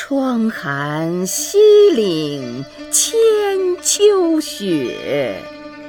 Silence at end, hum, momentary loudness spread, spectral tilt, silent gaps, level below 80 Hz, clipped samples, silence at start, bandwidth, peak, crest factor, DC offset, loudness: 0 s; none; 13 LU; -3.5 dB/octave; none; -56 dBFS; under 0.1%; 0 s; 20 kHz; -2 dBFS; 14 dB; under 0.1%; -15 LUFS